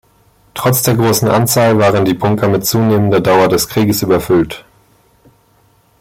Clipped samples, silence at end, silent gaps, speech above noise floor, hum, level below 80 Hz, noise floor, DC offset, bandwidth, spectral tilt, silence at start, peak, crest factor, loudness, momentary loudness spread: under 0.1%; 1.4 s; none; 41 dB; none; -44 dBFS; -52 dBFS; under 0.1%; 17 kHz; -5 dB/octave; 0.55 s; 0 dBFS; 12 dB; -12 LUFS; 4 LU